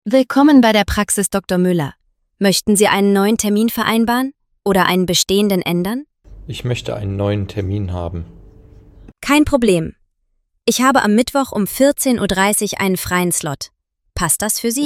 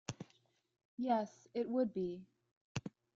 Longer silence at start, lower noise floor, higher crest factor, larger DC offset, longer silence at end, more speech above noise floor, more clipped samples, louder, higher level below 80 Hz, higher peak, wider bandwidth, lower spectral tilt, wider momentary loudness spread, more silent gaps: about the same, 0.05 s vs 0.1 s; second, -66 dBFS vs -74 dBFS; about the same, 16 dB vs 20 dB; neither; second, 0 s vs 0.25 s; first, 51 dB vs 36 dB; neither; first, -16 LUFS vs -40 LUFS; first, -38 dBFS vs -72 dBFS; first, 0 dBFS vs -22 dBFS; first, 17 kHz vs 7.8 kHz; second, -4 dB/octave vs -6 dB/octave; second, 13 LU vs 17 LU; second, none vs 0.85-0.97 s, 2.51-2.75 s